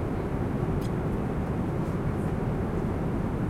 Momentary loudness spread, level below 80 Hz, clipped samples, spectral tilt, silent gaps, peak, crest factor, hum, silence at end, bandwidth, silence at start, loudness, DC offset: 1 LU; -38 dBFS; under 0.1%; -9 dB/octave; none; -16 dBFS; 12 dB; none; 0 s; 15.5 kHz; 0 s; -30 LUFS; under 0.1%